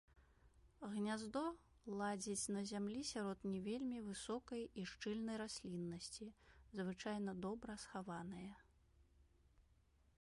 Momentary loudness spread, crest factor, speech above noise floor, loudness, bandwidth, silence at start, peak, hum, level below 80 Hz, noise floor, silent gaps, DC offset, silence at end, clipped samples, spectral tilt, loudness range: 9 LU; 16 dB; 28 dB; -47 LUFS; 11.5 kHz; 0.15 s; -32 dBFS; none; -72 dBFS; -75 dBFS; none; under 0.1%; 0.6 s; under 0.1%; -4.5 dB/octave; 5 LU